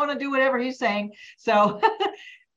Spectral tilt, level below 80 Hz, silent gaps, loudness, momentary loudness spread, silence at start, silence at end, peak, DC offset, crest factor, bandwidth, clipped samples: -5 dB/octave; -72 dBFS; none; -23 LUFS; 11 LU; 0 s; 0.2 s; -6 dBFS; under 0.1%; 18 dB; 7.8 kHz; under 0.1%